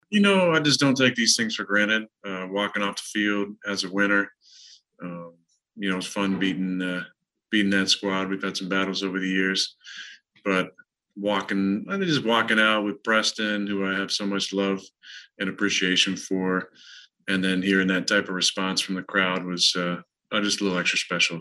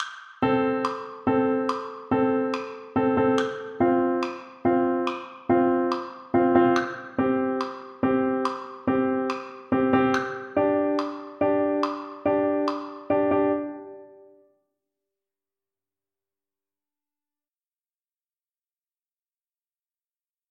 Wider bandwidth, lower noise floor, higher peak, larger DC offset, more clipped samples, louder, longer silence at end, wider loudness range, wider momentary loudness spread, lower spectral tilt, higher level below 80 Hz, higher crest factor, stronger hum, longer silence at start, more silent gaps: first, 12.5 kHz vs 8.6 kHz; second, -52 dBFS vs under -90 dBFS; about the same, -6 dBFS vs -6 dBFS; neither; neither; about the same, -24 LUFS vs -25 LUFS; second, 0 s vs 6.45 s; about the same, 4 LU vs 4 LU; first, 14 LU vs 9 LU; second, -3.5 dB/octave vs -6.5 dB/octave; second, -76 dBFS vs -62 dBFS; about the same, 18 dB vs 20 dB; neither; about the same, 0.1 s vs 0 s; neither